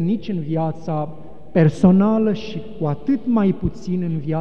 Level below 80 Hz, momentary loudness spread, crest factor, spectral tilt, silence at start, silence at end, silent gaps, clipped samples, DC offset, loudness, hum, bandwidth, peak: -44 dBFS; 11 LU; 16 dB; -9 dB/octave; 0 s; 0 s; none; under 0.1%; 2%; -20 LUFS; none; 8.4 kHz; -4 dBFS